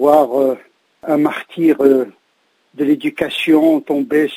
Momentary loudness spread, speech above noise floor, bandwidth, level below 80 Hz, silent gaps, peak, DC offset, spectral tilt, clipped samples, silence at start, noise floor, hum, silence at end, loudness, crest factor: 8 LU; 47 dB; 16 kHz; -62 dBFS; none; 0 dBFS; under 0.1%; -6 dB/octave; under 0.1%; 0 s; -61 dBFS; none; 0 s; -15 LUFS; 16 dB